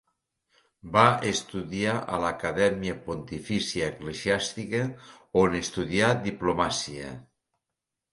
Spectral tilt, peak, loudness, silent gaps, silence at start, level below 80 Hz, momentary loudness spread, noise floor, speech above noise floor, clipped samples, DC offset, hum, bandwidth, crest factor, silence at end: -4.5 dB/octave; -4 dBFS; -27 LUFS; none; 0.85 s; -52 dBFS; 13 LU; -86 dBFS; 60 dB; under 0.1%; under 0.1%; none; 11.5 kHz; 24 dB; 0.9 s